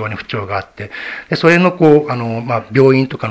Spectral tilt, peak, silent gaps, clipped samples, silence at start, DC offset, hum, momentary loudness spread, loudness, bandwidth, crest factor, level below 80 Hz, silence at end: -7.5 dB/octave; 0 dBFS; none; 0.3%; 0 s; under 0.1%; none; 14 LU; -13 LUFS; 8 kHz; 14 dB; -48 dBFS; 0 s